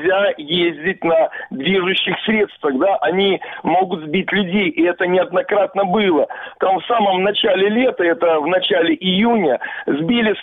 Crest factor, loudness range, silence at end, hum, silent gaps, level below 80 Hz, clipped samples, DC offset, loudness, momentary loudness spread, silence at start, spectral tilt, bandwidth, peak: 10 dB; 2 LU; 0 s; none; none; -56 dBFS; under 0.1%; under 0.1%; -17 LUFS; 4 LU; 0 s; -8 dB/octave; 4.2 kHz; -6 dBFS